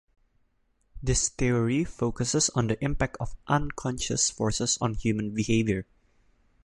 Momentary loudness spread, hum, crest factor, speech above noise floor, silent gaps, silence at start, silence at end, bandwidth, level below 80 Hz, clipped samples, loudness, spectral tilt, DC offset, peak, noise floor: 6 LU; none; 18 dB; 42 dB; none; 0.95 s; 0.85 s; 11.5 kHz; -42 dBFS; under 0.1%; -27 LUFS; -4 dB/octave; under 0.1%; -10 dBFS; -69 dBFS